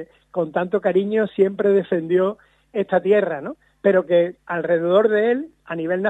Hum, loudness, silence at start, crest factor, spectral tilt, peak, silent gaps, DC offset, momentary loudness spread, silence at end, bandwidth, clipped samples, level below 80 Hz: none; -20 LUFS; 0 s; 16 dB; -8.5 dB/octave; -4 dBFS; none; under 0.1%; 12 LU; 0 s; 4 kHz; under 0.1%; -66 dBFS